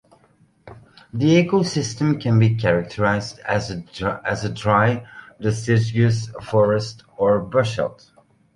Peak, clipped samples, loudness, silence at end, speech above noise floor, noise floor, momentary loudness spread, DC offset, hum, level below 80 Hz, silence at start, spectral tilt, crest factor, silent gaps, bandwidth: -2 dBFS; under 0.1%; -20 LUFS; 0.6 s; 38 dB; -57 dBFS; 9 LU; under 0.1%; none; -50 dBFS; 0.65 s; -6.5 dB/octave; 18 dB; none; 11 kHz